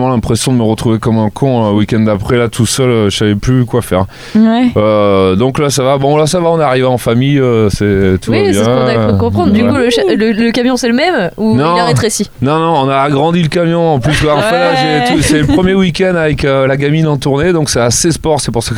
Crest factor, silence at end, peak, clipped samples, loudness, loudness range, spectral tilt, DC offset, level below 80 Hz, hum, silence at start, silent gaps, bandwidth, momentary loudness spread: 10 dB; 0 s; 0 dBFS; under 0.1%; -10 LUFS; 1 LU; -5.5 dB/octave; under 0.1%; -32 dBFS; none; 0 s; none; 16 kHz; 3 LU